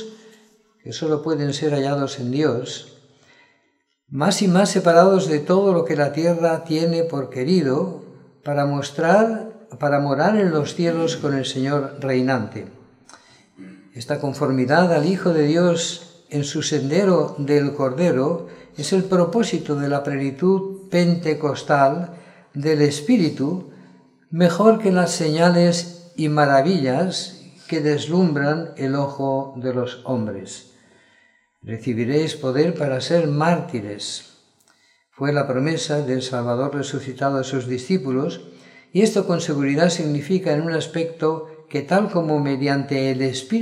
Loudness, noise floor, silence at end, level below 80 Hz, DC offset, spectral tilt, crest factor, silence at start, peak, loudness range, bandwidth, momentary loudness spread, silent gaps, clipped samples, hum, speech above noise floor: -20 LUFS; -67 dBFS; 0 s; -68 dBFS; under 0.1%; -6 dB/octave; 20 dB; 0 s; 0 dBFS; 6 LU; 12.5 kHz; 12 LU; none; under 0.1%; none; 48 dB